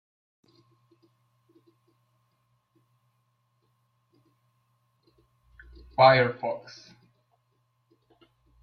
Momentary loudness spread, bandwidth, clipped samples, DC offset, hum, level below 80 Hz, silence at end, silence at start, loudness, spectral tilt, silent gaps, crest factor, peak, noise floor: 28 LU; 6.4 kHz; under 0.1%; under 0.1%; none; -64 dBFS; 2.05 s; 6 s; -23 LUFS; -6.5 dB/octave; none; 26 dB; -6 dBFS; -73 dBFS